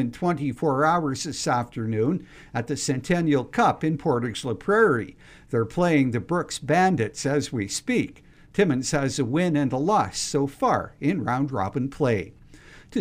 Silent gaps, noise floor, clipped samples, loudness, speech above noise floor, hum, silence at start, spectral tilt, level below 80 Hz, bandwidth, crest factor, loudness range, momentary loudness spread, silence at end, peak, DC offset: none; -48 dBFS; under 0.1%; -24 LUFS; 24 dB; none; 0 s; -5.5 dB/octave; -52 dBFS; 15.5 kHz; 16 dB; 2 LU; 8 LU; 0 s; -8 dBFS; under 0.1%